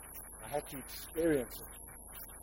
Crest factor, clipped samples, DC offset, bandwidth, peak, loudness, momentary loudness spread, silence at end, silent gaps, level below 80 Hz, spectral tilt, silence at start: 18 dB; under 0.1%; under 0.1%; 16.5 kHz; -20 dBFS; -39 LUFS; 15 LU; 0 s; none; -56 dBFS; -4.5 dB/octave; 0 s